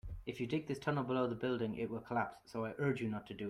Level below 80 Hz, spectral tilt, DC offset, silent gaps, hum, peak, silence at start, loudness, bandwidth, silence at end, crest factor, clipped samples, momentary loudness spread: -60 dBFS; -7.5 dB/octave; under 0.1%; none; none; -22 dBFS; 0.05 s; -39 LUFS; 14 kHz; 0 s; 16 dB; under 0.1%; 7 LU